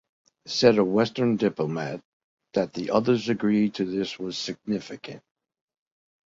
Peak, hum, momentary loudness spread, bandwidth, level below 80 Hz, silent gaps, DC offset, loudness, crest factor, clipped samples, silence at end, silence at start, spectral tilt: -2 dBFS; none; 12 LU; 7.8 kHz; -64 dBFS; 2.05-2.37 s; under 0.1%; -25 LUFS; 24 dB; under 0.1%; 1.1 s; 0.45 s; -6 dB/octave